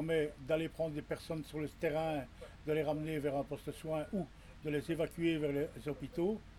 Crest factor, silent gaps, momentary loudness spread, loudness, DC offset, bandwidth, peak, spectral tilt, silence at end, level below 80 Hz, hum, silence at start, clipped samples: 16 dB; none; 8 LU; -38 LUFS; under 0.1%; 16 kHz; -22 dBFS; -7 dB/octave; 0 s; -58 dBFS; none; 0 s; under 0.1%